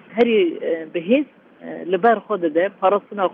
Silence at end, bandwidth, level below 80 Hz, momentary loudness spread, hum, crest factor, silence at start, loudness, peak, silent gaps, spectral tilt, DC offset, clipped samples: 0 s; 4.9 kHz; -70 dBFS; 15 LU; none; 16 dB; 0.1 s; -19 LUFS; -4 dBFS; none; -8 dB/octave; under 0.1%; under 0.1%